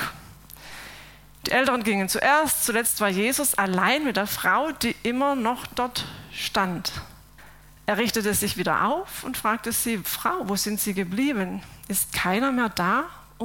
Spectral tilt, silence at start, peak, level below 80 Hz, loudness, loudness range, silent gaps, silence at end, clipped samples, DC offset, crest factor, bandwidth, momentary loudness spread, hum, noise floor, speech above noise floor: -3 dB/octave; 0 s; -6 dBFS; -52 dBFS; -24 LUFS; 5 LU; none; 0 s; under 0.1%; under 0.1%; 20 dB; 17 kHz; 12 LU; none; -49 dBFS; 24 dB